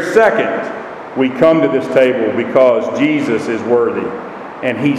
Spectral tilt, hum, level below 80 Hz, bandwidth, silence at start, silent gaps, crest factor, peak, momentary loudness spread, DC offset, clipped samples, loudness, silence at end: -6.5 dB/octave; none; -56 dBFS; 13 kHz; 0 s; none; 14 dB; 0 dBFS; 13 LU; under 0.1%; under 0.1%; -14 LUFS; 0 s